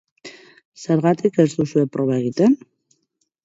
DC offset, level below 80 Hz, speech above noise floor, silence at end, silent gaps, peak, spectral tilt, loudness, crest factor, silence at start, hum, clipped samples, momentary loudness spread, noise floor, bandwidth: under 0.1%; -64 dBFS; 53 dB; 0.9 s; 0.65-0.72 s; -2 dBFS; -7.5 dB/octave; -19 LUFS; 18 dB; 0.25 s; none; under 0.1%; 22 LU; -71 dBFS; 8 kHz